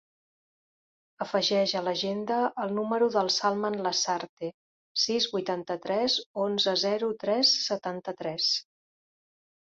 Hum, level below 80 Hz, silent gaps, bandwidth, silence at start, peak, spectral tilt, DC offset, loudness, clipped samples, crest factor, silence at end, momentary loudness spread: none; -74 dBFS; 4.29-4.37 s, 4.54-4.95 s, 6.26-6.34 s; 7.8 kHz; 1.2 s; -10 dBFS; -3 dB/octave; under 0.1%; -27 LUFS; under 0.1%; 18 dB; 1.1 s; 9 LU